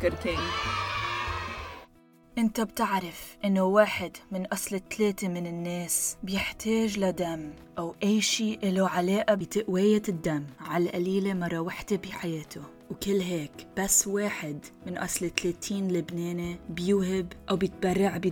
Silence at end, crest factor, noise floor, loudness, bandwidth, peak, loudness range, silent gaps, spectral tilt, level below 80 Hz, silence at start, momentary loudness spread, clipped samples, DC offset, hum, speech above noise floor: 0 s; 22 dB; -58 dBFS; -29 LUFS; 19 kHz; -8 dBFS; 4 LU; none; -4 dB/octave; -52 dBFS; 0 s; 12 LU; under 0.1%; under 0.1%; none; 29 dB